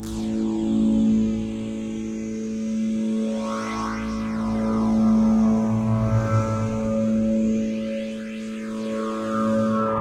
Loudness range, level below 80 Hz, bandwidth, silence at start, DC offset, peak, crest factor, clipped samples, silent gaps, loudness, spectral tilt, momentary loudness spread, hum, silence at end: 5 LU; -42 dBFS; 9.6 kHz; 0 s; under 0.1%; -10 dBFS; 12 dB; under 0.1%; none; -23 LUFS; -7.5 dB/octave; 10 LU; none; 0 s